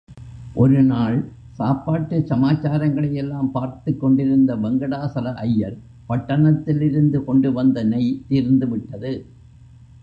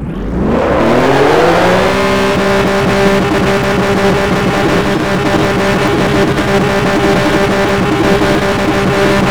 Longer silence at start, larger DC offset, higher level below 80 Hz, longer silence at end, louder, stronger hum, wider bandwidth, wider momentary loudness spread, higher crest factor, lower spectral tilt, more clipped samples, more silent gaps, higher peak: about the same, 0.1 s vs 0 s; second, under 0.1% vs 3%; second, -48 dBFS vs -28 dBFS; first, 0.8 s vs 0 s; second, -20 LUFS vs -11 LUFS; neither; second, 5.4 kHz vs over 20 kHz; first, 11 LU vs 3 LU; about the same, 14 dB vs 10 dB; first, -10.5 dB/octave vs -5.5 dB/octave; neither; neither; second, -4 dBFS vs 0 dBFS